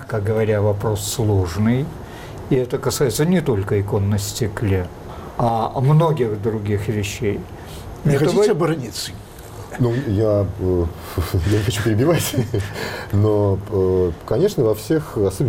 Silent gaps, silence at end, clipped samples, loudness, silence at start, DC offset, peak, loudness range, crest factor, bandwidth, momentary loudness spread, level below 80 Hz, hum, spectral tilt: none; 0 s; under 0.1%; -20 LUFS; 0 s; under 0.1%; -8 dBFS; 2 LU; 12 dB; 17 kHz; 12 LU; -38 dBFS; none; -6.5 dB/octave